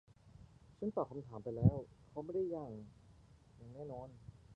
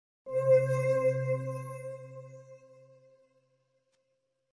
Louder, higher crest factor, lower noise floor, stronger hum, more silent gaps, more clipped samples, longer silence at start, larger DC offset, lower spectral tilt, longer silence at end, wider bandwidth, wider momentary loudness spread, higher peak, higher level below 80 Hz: second, -41 LUFS vs -29 LUFS; first, 26 dB vs 18 dB; second, -64 dBFS vs -79 dBFS; neither; neither; neither; about the same, 0.25 s vs 0.25 s; neither; first, -11.5 dB/octave vs -8 dB/octave; second, 0 s vs 1.95 s; second, 5.6 kHz vs 11 kHz; first, 25 LU vs 22 LU; about the same, -16 dBFS vs -14 dBFS; first, -58 dBFS vs -76 dBFS